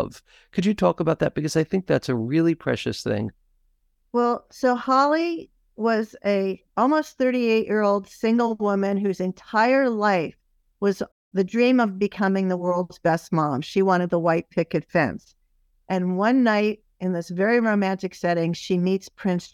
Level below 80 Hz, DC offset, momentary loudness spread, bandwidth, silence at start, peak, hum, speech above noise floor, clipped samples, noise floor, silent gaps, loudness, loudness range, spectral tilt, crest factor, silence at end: -58 dBFS; under 0.1%; 8 LU; 14 kHz; 0 s; -6 dBFS; none; 44 dB; under 0.1%; -66 dBFS; 11.12-11.31 s; -23 LUFS; 2 LU; -6.5 dB/octave; 16 dB; 0.05 s